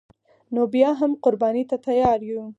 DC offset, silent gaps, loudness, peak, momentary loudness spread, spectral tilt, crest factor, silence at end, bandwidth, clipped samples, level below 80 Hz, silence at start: under 0.1%; none; -21 LUFS; -4 dBFS; 6 LU; -7.5 dB/octave; 18 dB; 0.05 s; 7.8 kHz; under 0.1%; -54 dBFS; 0.5 s